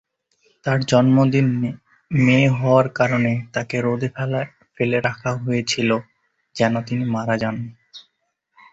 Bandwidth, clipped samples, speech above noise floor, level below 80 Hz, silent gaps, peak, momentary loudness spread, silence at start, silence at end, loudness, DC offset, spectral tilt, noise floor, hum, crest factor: 8 kHz; under 0.1%; 53 dB; -56 dBFS; none; -2 dBFS; 11 LU; 0.65 s; 0.75 s; -20 LUFS; under 0.1%; -6.5 dB/octave; -72 dBFS; none; 18 dB